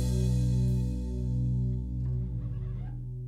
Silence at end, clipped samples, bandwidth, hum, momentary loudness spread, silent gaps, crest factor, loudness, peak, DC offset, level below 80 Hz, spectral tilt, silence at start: 0 s; under 0.1%; 12 kHz; none; 9 LU; none; 12 dB; -31 LUFS; -18 dBFS; under 0.1%; -34 dBFS; -8.5 dB/octave; 0 s